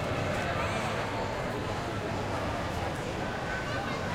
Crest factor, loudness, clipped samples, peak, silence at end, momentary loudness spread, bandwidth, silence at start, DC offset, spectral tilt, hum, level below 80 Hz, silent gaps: 14 dB; -32 LUFS; under 0.1%; -18 dBFS; 0 s; 3 LU; 16.5 kHz; 0 s; under 0.1%; -5 dB/octave; none; -46 dBFS; none